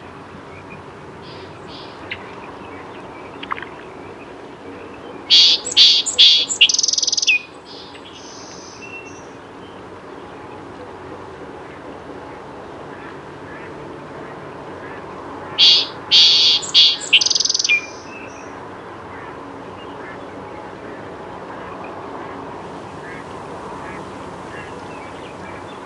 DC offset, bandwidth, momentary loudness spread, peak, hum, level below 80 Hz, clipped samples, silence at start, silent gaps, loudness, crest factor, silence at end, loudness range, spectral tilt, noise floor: under 0.1%; 11.5 kHz; 26 LU; 0 dBFS; none; -56 dBFS; under 0.1%; 0 s; none; -11 LUFS; 22 dB; 0 s; 23 LU; 0 dB/octave; -37 dBFS